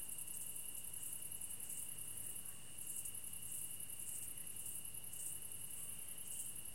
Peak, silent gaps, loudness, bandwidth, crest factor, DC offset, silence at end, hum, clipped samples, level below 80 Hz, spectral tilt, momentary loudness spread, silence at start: -30 dBFS; none; -46 LUFS; 16.5 kHz; 18 dB; 0.3%; 0 s; none; under 0.1%; -72 dBFS; -0.5 dB/octave; 2 LU; 0 s